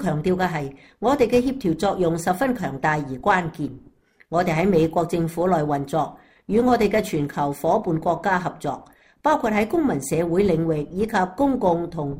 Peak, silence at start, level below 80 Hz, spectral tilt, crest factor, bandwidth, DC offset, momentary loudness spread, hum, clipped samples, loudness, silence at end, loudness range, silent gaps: -6 dBFS; 0 s; -48 dBFS; -6.5 dB/octave; 16 dB; 16 kHz; under 0.1%; 7 LU; none; under 0.1%; -22 LUFS; 0 s; 1 LU; none